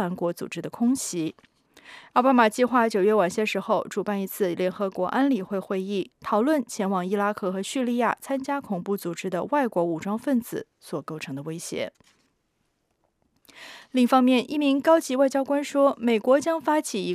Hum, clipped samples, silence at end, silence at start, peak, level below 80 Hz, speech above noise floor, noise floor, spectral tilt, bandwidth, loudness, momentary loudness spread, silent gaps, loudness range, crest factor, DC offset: none; under 0.1%; 0 s; 0 s; -6 dBFS; -72 dBFS; 49 dB; -73 dBFS; -5 dB/octave; 15.5 kHz; -24 LUFS; 13 LU; none; 8 LU; 18 dB; under 0.1%